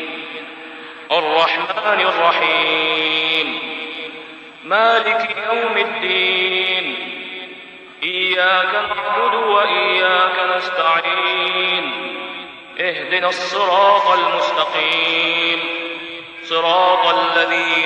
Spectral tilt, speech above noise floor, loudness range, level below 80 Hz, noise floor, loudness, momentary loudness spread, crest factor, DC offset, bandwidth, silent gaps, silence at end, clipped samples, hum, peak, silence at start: -2.5 dB/octave; 21 dB; 2 LU; -66 dBFS; -37 dBFS; -16 LUFS; 16 LU; 16 dB; under 0.1%; 9.6 kHz; none; 0 s; under 0.1%; none; -2 dBFS; 0 s